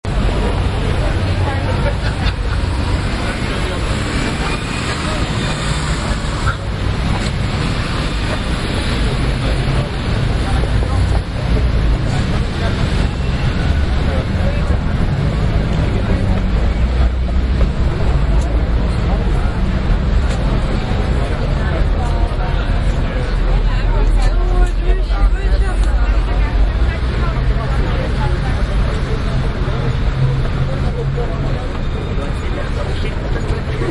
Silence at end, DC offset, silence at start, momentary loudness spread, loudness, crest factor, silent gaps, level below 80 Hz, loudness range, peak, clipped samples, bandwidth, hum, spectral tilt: 0 s; under 0.1%; 0.05 s; 3 LU; -18 LUFS; 14 dB; none; -18 dBFS; 2 LU; -2 dBFS; under 0.1%; 11.5 kHz; none; -6.5 dB/octave